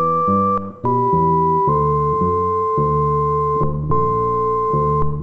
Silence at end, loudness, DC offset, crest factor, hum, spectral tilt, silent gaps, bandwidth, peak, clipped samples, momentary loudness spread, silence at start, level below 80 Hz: 0 s; -17 LUFS; under 0.1%; 12 dB; none; -11 dB/octave; none; 4 kHz; -4 dBFS; under 0.1%; 4 LU; 0 s; -34 dBFS